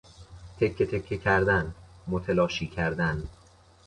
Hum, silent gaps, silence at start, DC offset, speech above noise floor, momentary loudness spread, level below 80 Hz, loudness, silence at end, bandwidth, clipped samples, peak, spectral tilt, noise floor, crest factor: none; none; 0.2 s; under 0.1%; 30 dB; 15 LU; -46 dBFS; -27 LUFS; 0.55 s; 10.5 kHz; under 0.1%; -10 dBFS; -6.5 dB/octave; -56 dBFS; 18 dB